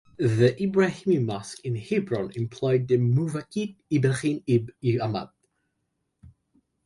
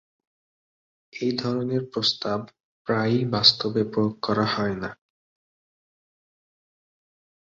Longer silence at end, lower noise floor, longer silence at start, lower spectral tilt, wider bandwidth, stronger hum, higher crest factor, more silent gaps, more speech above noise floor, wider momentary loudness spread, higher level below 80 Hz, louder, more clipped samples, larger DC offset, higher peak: second, 0.55 s vs 2.45 s; second, -77 dBFS vs under -90 dBFS; second, 0.2 s vs 1.15 s; first, -7.5 dB/octave vs -5.5 dB/octave; first, 11.5 kHz vs 7.6 kHz; neither; second, 18 dB vs 24 dB; second, none vs 2.60-2.85 s; second, 53 dB vs over 66 dB; second, 10 LU vs 14 LU; about the same, -60 dBFS vs -60 dBFS; second, -26 LUFS vs -23 LUFS; neither; neither; second, -8 dBFS vs -2 dBFS